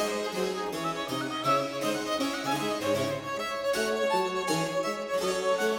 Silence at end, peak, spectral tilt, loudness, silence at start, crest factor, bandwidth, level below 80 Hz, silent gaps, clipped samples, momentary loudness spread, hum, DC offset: 0 s; -14 dBFS; -3.5 dB/octave; -29 LUFS; 0 s; 14 dB; 18.5 kHz; -64 dBFS; none; under 0.1%; 5 LU; none; under 0.1%